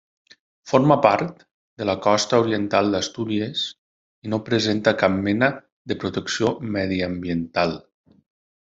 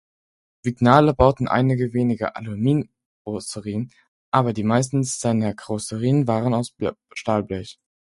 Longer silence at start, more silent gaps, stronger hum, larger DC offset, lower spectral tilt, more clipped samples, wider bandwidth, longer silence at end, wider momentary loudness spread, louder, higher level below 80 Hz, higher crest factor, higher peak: about the same, 0.65 s vs 0.65 s; first, 1.51-1.77 s, 3.78-4.22 s, 5.72-5.85 s vs 3.06-3.25 s, 4.08-4.32 s; neither; neither; second, -5 dB/octave vs -6.5 dB/octave; neither; second, 8 kHz vs 11.5 kHz; first, 0.8 s vs 0.5 s; second, 10 LU vs 14 LU; about the same, -22 LUFS vs -22 LUFS; second, -60 dBFS vs -44 dBFS; about the same, 22 dB vs 22 dB; about the same, 0 dBFS vs 0 dBFS